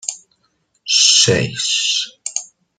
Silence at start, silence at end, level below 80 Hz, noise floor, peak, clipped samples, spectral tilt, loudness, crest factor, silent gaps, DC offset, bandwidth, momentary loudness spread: 0.05 s; 0.35 s; -54 dBFS; -64 dBFS; 0 dBFS; under 0.1%; -1.5 dB/octave; -14 LUFS; 18 dB; none; under 0.1%; 12.5 kHz; 17 LU